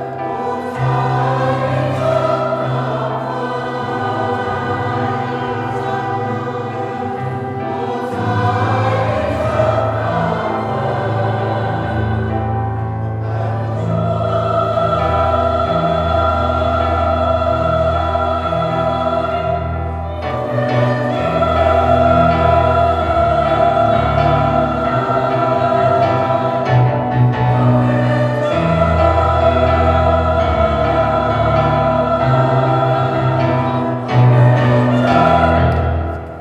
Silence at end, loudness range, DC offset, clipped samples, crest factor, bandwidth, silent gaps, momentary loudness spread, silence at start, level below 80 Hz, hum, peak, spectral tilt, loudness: 0 s; 6 LU; under 0.1%; under 0.1%; 14 dB; 8.4 kHz; none; 8 LU; 0 s; -30 dBFS; none; 0 dBFS; -8 dB/octave; -16 LUFS